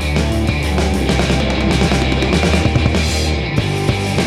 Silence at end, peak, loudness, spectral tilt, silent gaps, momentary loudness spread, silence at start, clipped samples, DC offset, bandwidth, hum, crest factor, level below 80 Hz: 0 s; 0 dBFS; -16 LUFS; -5.5 dB/octave; none; 3 LU; 0 s; under 0.1%; 0.6%; 14 kHz; none; 14 dB; -22 dBFS